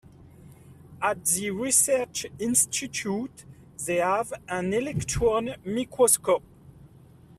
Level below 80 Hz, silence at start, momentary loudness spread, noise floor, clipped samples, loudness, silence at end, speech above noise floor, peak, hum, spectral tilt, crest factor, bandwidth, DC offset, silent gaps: -52 dBFS; 0.4 s; 11 LU; -52 dBFS; under 0.1%; -25 LUFS; 0.5 s; 26 dB; -6 dBFS; none; -3 dB/octave; 22 dB; 15.5 kHz; under 0.1%; none